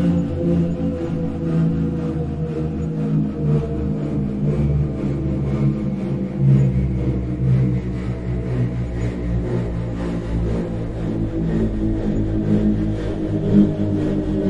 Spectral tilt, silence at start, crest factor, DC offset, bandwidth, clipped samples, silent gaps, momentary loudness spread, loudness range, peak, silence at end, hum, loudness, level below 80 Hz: -10 dB/octave; 0 s; 18 dB; under 0.1%; 8 kHz; under 0.1%; none; 7 LU; 3 LU; -2 dBFS; 0 s; none; -21 LUFS; -30 dBFS